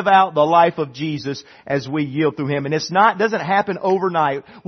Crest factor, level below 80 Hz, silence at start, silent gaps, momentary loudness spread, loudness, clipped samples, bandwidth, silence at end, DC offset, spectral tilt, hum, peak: 18 dB; -64 dBFS; 0 s; none; 10 LU; -18 LUFS; under 0.1%; 6.4 kHz; 0.1 s; under 0.1%; -6 dB/octave; none; 0 dBFS